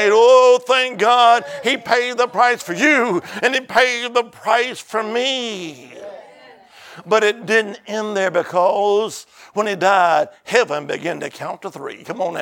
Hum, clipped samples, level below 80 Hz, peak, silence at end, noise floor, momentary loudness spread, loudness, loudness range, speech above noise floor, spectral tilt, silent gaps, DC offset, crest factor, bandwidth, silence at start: none; under 0.1%; -72 dBFS; 0 dBFS; 0 s; -45 dBFS; 16 LU; -17 LUFS; 6 LU; 27 dB; -3 dB/octave; none; under 0.1%; 18 dB; 17 kHz; 0 s